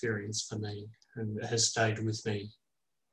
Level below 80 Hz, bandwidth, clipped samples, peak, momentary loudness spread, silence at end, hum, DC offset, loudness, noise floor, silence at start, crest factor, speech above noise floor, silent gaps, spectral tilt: -66 dBFS; 11.5 kHz; under 0.1%; -14 dBFS; 16 LU; 0.6 s; none; under 0.1%; -33 LUFS; -88 dBFS; 0 s; 20 dB; 54 dB; none; -3.5 dB/octave